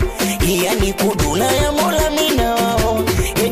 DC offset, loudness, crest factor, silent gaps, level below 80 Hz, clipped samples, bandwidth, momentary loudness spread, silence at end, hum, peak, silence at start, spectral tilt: under 0.1%; -16 LUFS; 10 dB; none; -26 dBFS; under 0.1%; 16 kHz; 2 LU; 0 s; none; -6 dBFS; 0 s; -4 dB/octave